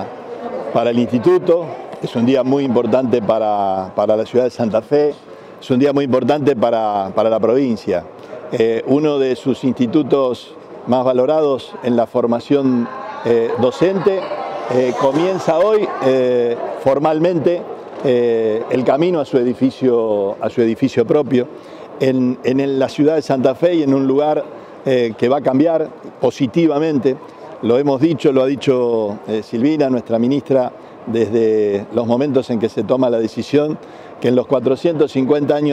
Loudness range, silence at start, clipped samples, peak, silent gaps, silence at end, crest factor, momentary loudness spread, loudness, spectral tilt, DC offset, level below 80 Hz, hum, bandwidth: 1 LU; 0 s; under 0.1%; -2 dBFS; none; 0 s; 12 dB; 8 LU; -16 LUFS; -7.5 dB/octave; under 0.1%; -60 dBFS; none; 10 kHz